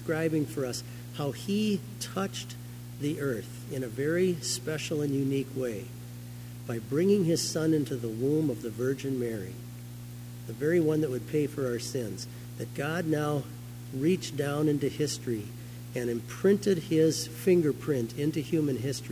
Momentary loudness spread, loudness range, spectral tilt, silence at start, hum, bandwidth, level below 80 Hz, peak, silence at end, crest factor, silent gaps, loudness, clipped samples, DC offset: 16 LU; 4 LU; -5.5 dB/octave; 0 s; 60 Hz at -40 dBFS; 16 kHz; -58 dBFS; -12 dBFS; 0 s; 18 dB; none; -30 LUFS; under 0.1%; under 0.1%